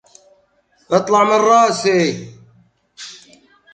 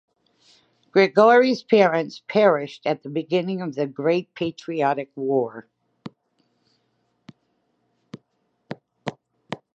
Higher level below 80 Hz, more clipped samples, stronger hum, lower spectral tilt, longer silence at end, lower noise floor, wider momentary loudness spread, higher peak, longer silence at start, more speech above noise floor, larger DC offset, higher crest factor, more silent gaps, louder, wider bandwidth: first, -64 dBFS vs -74 dBFS; neither; neither; second, -4.5 dB/octave vs -6.5 dB/octave; first, 0.6 s vs 0.2 s; second, -59 dBFS vs -71 dBFS; about the same, 22 LU vs 24 LU; about the same, 0 dBFS vs -2 dBFS; about the same, 0.9 s vs 0.95 s; second, 45 dB vs 51 dB; neither; about the same, 18 dB vs 20 dB; neither; first, -14 LUFS vs -21 LUFS; first, 9.4 kHz vs 7.8 kHz